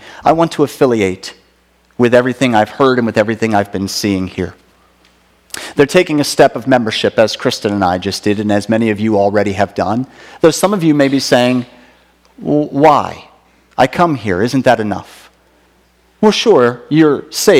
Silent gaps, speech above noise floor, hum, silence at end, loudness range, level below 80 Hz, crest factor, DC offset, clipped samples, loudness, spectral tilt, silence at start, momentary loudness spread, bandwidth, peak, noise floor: none; 40 dB; none; 0 s; 3 LU; -50 dBFS; 14 dB; under 0.1%; 0.5%; -13 LUFS; -5 dB/octave; 0.05 s; 11 LU; 16.5 kHz; 0 dBFS; -53 dBFS